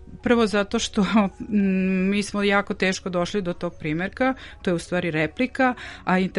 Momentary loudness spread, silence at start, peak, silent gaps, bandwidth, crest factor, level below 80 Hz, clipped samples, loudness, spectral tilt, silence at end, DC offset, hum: 6 LU; 0 s; -6 dBFS; none; 11.5 kHz; 16 dB; -46 dBFS; under 0.1%; -23 LUFS; -5.5 dB/octave; 0 s; under 0.1%; none